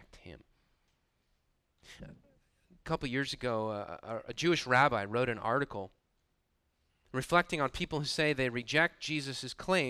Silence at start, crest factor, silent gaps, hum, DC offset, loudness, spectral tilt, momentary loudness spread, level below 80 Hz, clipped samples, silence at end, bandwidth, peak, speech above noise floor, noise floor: 0.15 s; 22 dB; none; none; under 0.1%; -32 LUFS; -4.5 dB/octave; 14 LU; -58 dBFS; under 0.1%; 0 s; 15 kHz; -12 dBFS; 45 dB; -78 dBFS